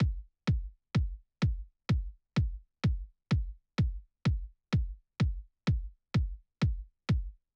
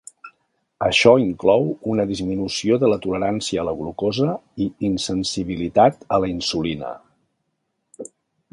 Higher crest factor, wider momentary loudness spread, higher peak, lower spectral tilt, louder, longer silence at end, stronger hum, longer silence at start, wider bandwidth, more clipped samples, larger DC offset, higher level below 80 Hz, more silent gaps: second, 14 dB vs 20 dB; second, 5 LU vs 15 LU; second, -18 dBFS vs 0 dBFS; first, -7.5 dB/octave vs -5 dB/octave; second, -35 LUFS vs -20 LUFS; second, 0.2 s vs 0.45 s; neither; second, 0 s vs 0.25 s; second, 8.2 kHz vs 11.5 kHz; neither; neither; first, -38 dBFS vs -48 dBFS; neither